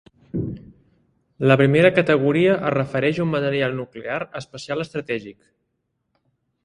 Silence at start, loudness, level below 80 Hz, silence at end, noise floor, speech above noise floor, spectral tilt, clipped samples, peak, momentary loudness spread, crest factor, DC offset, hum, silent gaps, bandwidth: 0.35 s; -20 LUFS; -54 dBFS; 1.35 s; -74 dBFS; 54 dB; -7.5 dB/octave; under 0.1%; 0 dBFS; 15 LU; 22 dB; under 0.1%; none; none; 10.5 kHz